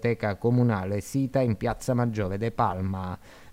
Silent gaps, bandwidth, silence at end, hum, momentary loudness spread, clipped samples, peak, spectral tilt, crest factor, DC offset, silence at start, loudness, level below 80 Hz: none; 15.5 kHz; 0 s; none; 8 LU; under 0.1%; -10 dBFS; -7.5 dB/octave; 16 dB; under 0.1%; 0 s; -27 LUFS; -50 dBFS